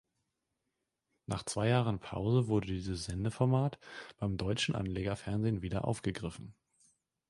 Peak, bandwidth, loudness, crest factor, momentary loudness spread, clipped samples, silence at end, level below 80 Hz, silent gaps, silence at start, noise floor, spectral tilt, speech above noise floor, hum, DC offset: -14 dBFS; 11.5 kHz; -34 LUFS; 20 dB; 12 LU; under 0.1%; 0.8 s; -54 dBFS; none; 1.3 s; -86 dBFS; -6 dB/octave; 52 dB; none; under 0.1%